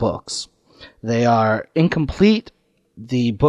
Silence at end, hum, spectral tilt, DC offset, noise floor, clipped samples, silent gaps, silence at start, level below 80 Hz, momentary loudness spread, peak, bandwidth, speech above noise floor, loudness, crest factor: 0 s; none; -6.5 dB/octave; under 0.1%; -47 dBFS; under 0.1%; none; 0 s; -42 dBFS; 12 LU; -2 dBFS; 11 kHz; 29 dB; -19 LUFS; 16 dB